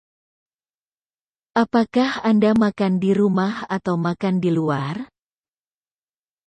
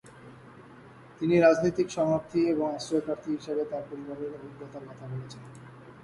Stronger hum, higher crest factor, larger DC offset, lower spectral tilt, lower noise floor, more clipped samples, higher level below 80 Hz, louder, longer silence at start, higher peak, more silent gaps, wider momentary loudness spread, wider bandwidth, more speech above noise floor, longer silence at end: neither; about the same, 16 dB vs 20 dB; neither; about the same, -7.5 dB/octave vs -6.5 dB/octave; first, under -90 dBFS vs -51 dBFS; neither; first, -58 dBFS vs -64 dBFS; first, -20 LUFS vs -28 LUFS; first, 1.55 s vs 0.05 s; first, -6 dBFS vs -10 dBFS; neither; second, 8 LU vs 23 LU; second, 9 kHz vs 11.5 kHz; first, over 71 dB vs 22 dB; first, 1.4 s vs 0 s